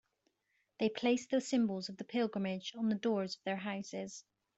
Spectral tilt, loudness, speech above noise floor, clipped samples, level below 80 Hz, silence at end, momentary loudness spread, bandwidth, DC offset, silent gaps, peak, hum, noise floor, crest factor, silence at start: -5 dB/octave; -36 LUFS; 45 dB; under 0.1%; -80 dBFS; 0.35 s; 10 LU; 8.2 kHz; under 0.1%; none; -20 dBFS; none; -81 dBFS; 18 dB; 0.8 s